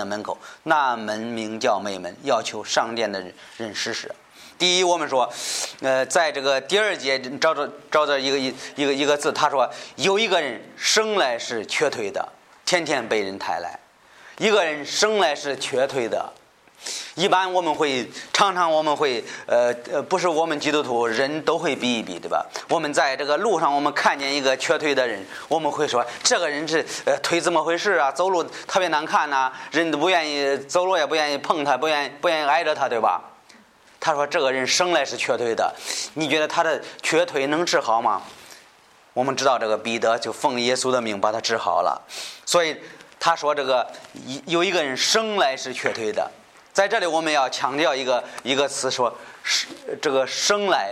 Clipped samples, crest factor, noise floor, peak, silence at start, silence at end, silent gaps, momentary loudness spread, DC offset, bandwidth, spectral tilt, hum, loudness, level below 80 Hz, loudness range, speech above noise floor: under 0.1%; 20 dB; -53 dBFS; -4 dBFS; 0 s; 0 s; none; 8 LU; under 0.1%; 15 kHz; -2 dB/octave; none; -22 LUFS; -72 dBFS; 2 LU; 31 dB